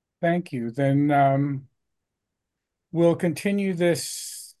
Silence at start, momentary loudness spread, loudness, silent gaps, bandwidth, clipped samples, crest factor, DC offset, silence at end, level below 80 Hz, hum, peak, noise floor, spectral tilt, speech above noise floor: 0.2 s; 12 LU; -24 LUFS; none; 12.5 kHz; under 0.1%; 18 dB; under 0.1%; 0.1 s; -70 dBFS; none; -8 dBFS; -83 dBFS; -6 dB/octave; 61 dB